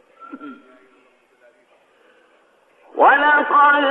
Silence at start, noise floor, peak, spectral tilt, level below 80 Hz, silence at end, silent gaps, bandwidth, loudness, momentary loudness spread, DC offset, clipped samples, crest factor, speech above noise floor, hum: 0.3 s; -57 dBFS; -2 dBFS; -4.5 dB/octave; -80 dBFS; 0 s; none; 4.1 kHz; -13 LUFS; 25 LU; under 0.1%; under 0.1%; 18 dB; 42 dB; none